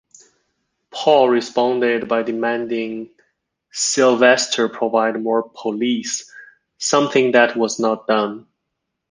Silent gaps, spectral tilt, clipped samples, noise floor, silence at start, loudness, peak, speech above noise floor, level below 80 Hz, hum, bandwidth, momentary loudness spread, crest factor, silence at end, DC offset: none; -3 dB/octave; under 0.1%; -77 dBFS; 0.95 s; -18 LUFS; -2 dBFS; 60 dB; -66 dBFS; none; 10 kHz; 12 LU; 18 dB; 0.7 s; under 0.1%